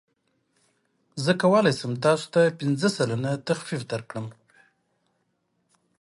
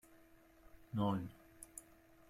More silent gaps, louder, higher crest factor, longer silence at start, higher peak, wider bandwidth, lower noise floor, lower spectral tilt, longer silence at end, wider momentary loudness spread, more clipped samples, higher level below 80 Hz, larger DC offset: neither; first, -24 LUFS vs -43 LUFS; about the same, 20 dB vs 20 dB; first, 1.15 s vs 0.1 s; first, -6 dBFS vs -24 dBFS; second, 11.5 kHz vs 15.5 kHz; first, -73 dBFS vs -65 dBFS; about the same, -5.5 dB/octave vs -6.5 dB/octave; first, 1.7 s vs 0.5 s; about the same, 15 LU vs 17 LU; neither; about the same, -70 dBFS vs -70 dBFS; neither